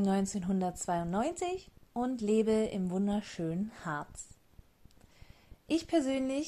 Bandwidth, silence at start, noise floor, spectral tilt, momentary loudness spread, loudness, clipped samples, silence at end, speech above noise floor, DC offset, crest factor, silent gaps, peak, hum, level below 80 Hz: 13.5 kHz; 0 s; -60 dBFS; -6 dB/octave; 10 LU; -33 LUFS; under 0.1%; 0 s; 28 dB; under 0.1%; 16 dB; none; -16 dBFS; none; -60 dBFS